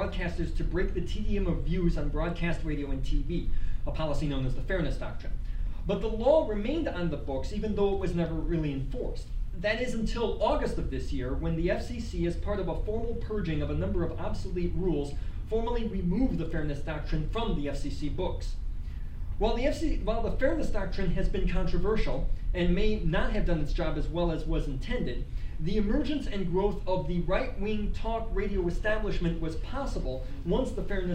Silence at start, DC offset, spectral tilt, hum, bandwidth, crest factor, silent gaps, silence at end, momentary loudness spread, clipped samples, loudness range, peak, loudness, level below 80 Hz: 0 s; under 0.1%; -7 dB/octave; none; 8.8 kHz; 16 dB; none; 0 s; 7 LU; under 0.1%; 2 LU; -12 dBFS; -32 LUFS; -32 dBFS